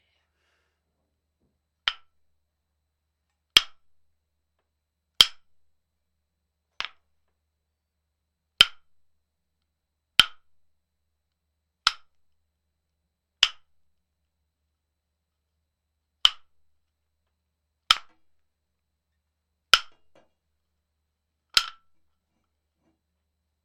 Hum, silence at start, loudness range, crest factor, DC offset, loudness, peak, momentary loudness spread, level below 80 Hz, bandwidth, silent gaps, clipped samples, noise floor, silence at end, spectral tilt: none; 1.85 s; 7 LU; 32 dB; under 0.1%; -22 LUFS; 0 dBFS; 17 LU; -60 dBFS; 16 kHz; none; under 0.1%; -81 dBFS; 1.95 s; 1.5 dB/octave